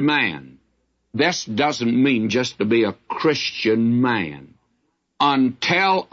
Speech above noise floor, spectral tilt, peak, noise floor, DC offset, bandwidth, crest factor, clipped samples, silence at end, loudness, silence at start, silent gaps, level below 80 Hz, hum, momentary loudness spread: 50 dB; -5 dB/octave; -6 dBFS; -70 dBFS; under 0.1%; 7.6 kHz; 16 dB; under 0.1%; 0.1 s; -20 LUFS; 0 s; none; -64 dBFS; none; 6 LU